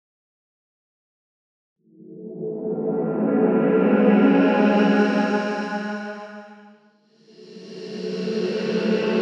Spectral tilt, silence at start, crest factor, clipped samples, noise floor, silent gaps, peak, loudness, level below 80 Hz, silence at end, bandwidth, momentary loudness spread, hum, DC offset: -7.5 dB/octave; 2.05 s; 18 dB; under 0.1%; -57 dBFS; none; -4 dBFS; -21 LUFS; -72 dBFS; 0 s; 7.4 kHz; 20 LU; none; under 0.1%